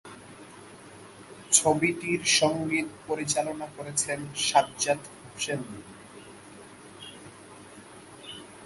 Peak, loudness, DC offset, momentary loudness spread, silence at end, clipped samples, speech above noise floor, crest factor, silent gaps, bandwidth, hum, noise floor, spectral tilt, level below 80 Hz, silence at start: -4 dBFS; -26 LUFS; under 0.1%; 25 LU; 0 s; under 0.1%; 20 dB; 26 dB; none; 12 kHz; none; -48 dBFS; -2.5 dB/octave; -64 dBFS; 0.05 s